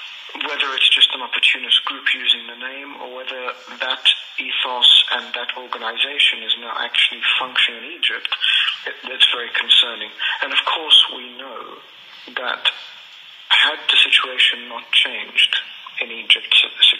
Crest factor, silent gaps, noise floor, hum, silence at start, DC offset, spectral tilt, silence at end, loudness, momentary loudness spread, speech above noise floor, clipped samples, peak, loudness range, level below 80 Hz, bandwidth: 18 dB; none; -41 dBFS; none; 0 s; under 0.1%; 1.5 dB/octave; 0 s; -15 LUFS; 18 LU; 22 dB; under 0.1%; 0 dBFS; 3 LU; -86 dBFS; 13.5 kHz